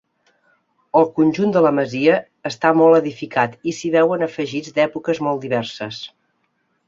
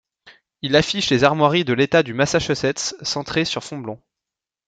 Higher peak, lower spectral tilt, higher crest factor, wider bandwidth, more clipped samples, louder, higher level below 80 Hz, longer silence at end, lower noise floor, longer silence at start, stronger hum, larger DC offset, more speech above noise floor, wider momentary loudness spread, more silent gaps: about the same, -2 dBFS vs 0 dBFS; first, -6 dB/octave vs -4.5 dB/octave; about the same, 18 dB vs 20 dB; second, 7.6 kHz vs 9.4 kHz; neither; about the same, -18 LUFS vs -19 LUFS; second, -64 dBFS vs -50 dBFS; about the same, 0.8 s vs 0.7 s; second, -68 dBFS vs -87 dBFS; first, 0.95 s vs 0.25 s; neither; neither; second, 50 dB vs 67 dB; about the same, 13 LU vs 14 LU; neither